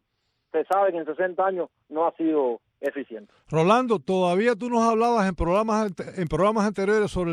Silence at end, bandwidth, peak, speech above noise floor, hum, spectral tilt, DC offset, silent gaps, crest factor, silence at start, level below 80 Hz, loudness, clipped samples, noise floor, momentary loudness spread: 0 s; 13.5 kHz; -6 dBFS; 52 dB; none; -6.5 dB/octave; under 0.1%; none; 16 dB; 0.55 s; -46 dBFS; -24 LUFS; under 0.1%; -75 dBFS; 10 LU